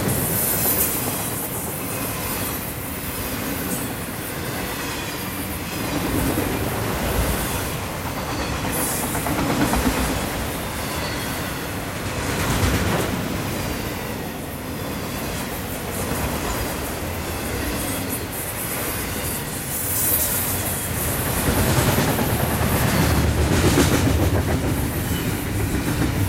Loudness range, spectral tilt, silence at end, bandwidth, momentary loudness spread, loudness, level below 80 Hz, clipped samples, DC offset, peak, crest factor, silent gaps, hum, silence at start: 6 LU; -4 dB/octave; 0 s; 16 kHz; 9 LU; -23 LUFS; -32 dBFS; under 0.1%; under 0.1%; -4 dBFS; 18 dB; none; none; 0 s